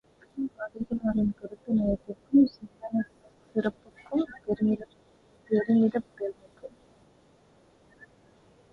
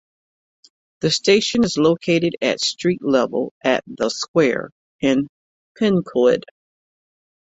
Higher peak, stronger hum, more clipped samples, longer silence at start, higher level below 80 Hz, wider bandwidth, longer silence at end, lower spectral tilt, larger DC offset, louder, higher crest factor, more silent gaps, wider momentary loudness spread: second, -12 dBFS vs -2 dBFS; neither; neither; second, 0.35 s vs 1 s; about the same, -56 dBFS vs -58 dBFS; second, 5.6 kHz vs 8.4 kHz; first, 2.05 s vs 1.15 s; first, -9.5 dB/octave vs -4.5 dB/octave; neither; second, -29 LUFS vs -19 LUFS; about the same, 18 dB vs 18 dB; second, none vs 3.51-3.61 s, 4.28-4.34 s, 4.72-4.99 s, 5.29-5.75 s; first, 20 LU vs 8 LU